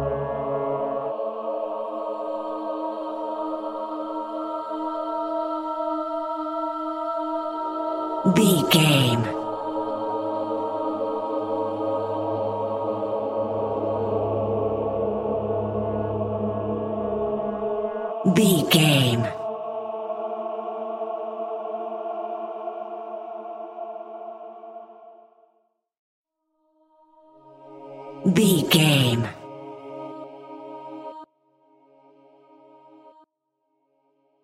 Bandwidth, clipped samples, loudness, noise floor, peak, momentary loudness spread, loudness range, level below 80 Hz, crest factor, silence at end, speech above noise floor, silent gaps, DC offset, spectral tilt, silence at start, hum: 16 kHz; under 0.1%; -25 LUFS; -76 dBFS; -4 dBFS; 19 LU; 16 LU; -56 dBFS; 22 dB; 1.35 s; 58 dB; 25.99-26.24 s; under 0.1%; -5 dB/octave; 0 s; none